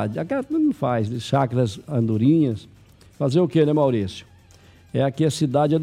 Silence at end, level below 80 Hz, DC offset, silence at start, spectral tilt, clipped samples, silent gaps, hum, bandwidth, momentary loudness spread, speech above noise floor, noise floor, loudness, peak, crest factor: 0 s; -56 dBFS; under 0.1%; 0 s; -7.5 dB/octave; under 0.1%; none; none; 13.5 kHz; 8 LU; 30 dB; -50 dBFS; -21 LUFS; -6 dBFS; 14 dB